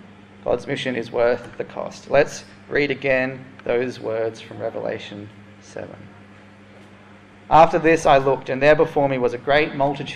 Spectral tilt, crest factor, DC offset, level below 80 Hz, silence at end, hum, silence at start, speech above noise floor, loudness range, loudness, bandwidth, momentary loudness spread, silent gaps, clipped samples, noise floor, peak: -5.5 dB/octave; 20 dB; under 0.1%; -48 dBFS; 0 s; none; 0.45 s; 26 dB; 12 LU; -20 LUFS; 11.5 kHz; 20 LU; none; under 0.1%; -46 dBFS; -2 dBFS